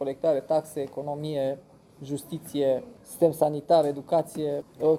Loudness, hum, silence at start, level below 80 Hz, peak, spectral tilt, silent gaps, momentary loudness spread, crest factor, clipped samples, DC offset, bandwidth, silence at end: -27 LUFS; none; 0 s; -66 dBFS; -8 dBFS; -6.5 dB/octave; none; 13 LU; 18 dB; under 0.1%; under 0.1%; 16 kHz; 0 s